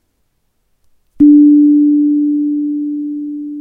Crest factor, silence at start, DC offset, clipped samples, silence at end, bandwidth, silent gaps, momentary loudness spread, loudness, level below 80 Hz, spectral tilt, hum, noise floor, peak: 12 dB; 1.2 s; under 0.1%; under 0.1%; 0 s; 0.5 kHz; none; 15 LU; -11 LUFS; -50 dBFS; -11.5 dB/octave; none; -62 dBFS; 0 dBFS